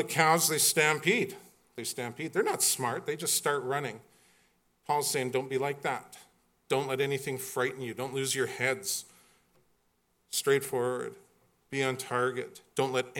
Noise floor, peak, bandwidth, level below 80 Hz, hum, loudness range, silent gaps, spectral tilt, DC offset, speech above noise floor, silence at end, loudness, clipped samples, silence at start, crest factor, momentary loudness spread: -73 dBFS; -8 dBFS; 17.5 kHz; -78 dBFS; none; 6 LU; none; -2.5 dB/octave; under 0.1%; 43 dB; 0 s; -30 LUFS; under 0.1%; 0 s; 24 dB; 13 LU